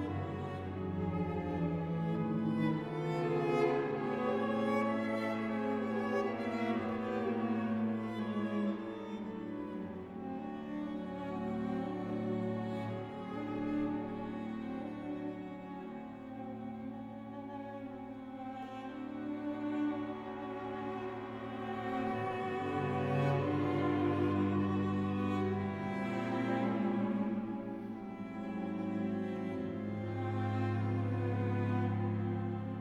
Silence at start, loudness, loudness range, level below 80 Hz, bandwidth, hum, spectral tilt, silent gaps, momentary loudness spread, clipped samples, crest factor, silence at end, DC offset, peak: 0 s; -37 LUFS; 8 LU; -64 dBFS; 9.8 kHz; none; -8.5 dB/octave; none; 11 LU; under 0.1%; 16 dB; 0 s; under 0.1%; -20 dBFS